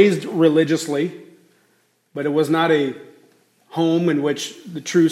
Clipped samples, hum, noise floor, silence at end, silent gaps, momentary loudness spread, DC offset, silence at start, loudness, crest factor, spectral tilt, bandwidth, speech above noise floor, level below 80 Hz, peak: under 0.1%; none; -62 dBFS; 0 s; none; 13 LU; under 0.1%; 0 s; -20 LUFS; 18 dB; -5.5 dB/octave; 14 kHz; 44 dB; -70 dBFS; -2 dBFS